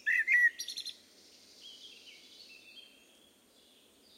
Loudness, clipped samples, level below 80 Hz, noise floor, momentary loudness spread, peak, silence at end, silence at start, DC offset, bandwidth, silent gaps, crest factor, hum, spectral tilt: -29 LUFS; under 0.1%; -88 dBFS; -64 dBFS; 27 LU; -16 dBFS; 1.35 s; 0.05 s; under 0.1%; 16 kHz; none; 20 dB; none; 2 dB/octave